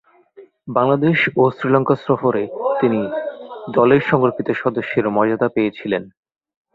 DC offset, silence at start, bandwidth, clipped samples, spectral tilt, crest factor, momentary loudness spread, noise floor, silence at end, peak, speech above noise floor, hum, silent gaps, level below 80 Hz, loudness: under 0.1%; 0.4 s; 5.2 kHz; under 0.1%; -9 dB/octave; 16 dB; 9 LU; -46 dBFS; 0.65 s; -2 dBFS; 29 dB; none; none; -58 dBFS; -18 LUFS